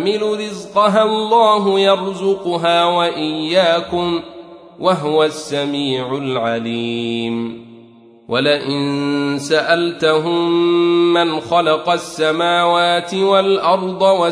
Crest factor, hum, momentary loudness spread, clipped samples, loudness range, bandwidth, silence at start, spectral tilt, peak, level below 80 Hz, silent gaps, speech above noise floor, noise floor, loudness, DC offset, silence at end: 14 dB; none; 7 LU; under 0.1%; 5 LU; 11 kHz; 0 s; -5 dB/octave; -2 dBFS; -58 dBFS; none; 28 dB; -44 dBFS; -16 LUFS; under 0.1%; 0 s